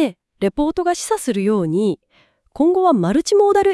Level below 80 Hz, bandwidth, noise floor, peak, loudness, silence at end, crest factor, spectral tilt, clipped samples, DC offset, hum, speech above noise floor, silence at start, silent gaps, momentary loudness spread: -46 dBFS; 12 kHz; -58 dBFS; -4 dBFS; -18 LUFS; 0 s; 14 dB; -5.5 dB/octave; under 0.1%; under 0.1%; none; 42 dB; 0 s; none; 8 LU